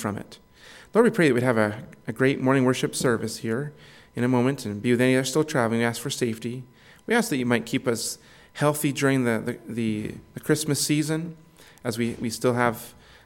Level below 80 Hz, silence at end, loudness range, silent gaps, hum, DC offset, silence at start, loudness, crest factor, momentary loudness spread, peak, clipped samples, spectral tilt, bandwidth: -60 dBFS; 0.35 s; 3 LU; none; none; under 0.1%; 0 s; -24 LUFS; 18 dB; 15 LU; -6 dBFS; under 0.1%; -5 dB/octave; 17.5 kHz